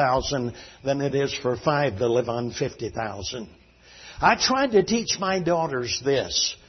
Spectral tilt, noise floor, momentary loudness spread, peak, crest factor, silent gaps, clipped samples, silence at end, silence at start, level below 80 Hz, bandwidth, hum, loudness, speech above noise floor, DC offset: -4 dB/octave; -49 dBFS; 12 LU; -2 dBFS; 22 dB; none; under 0.1%; 0.15 s; 0 s; -50 dBFS; 6.4 kHz; none; -24 LUFS; 24 dB; under 0.1%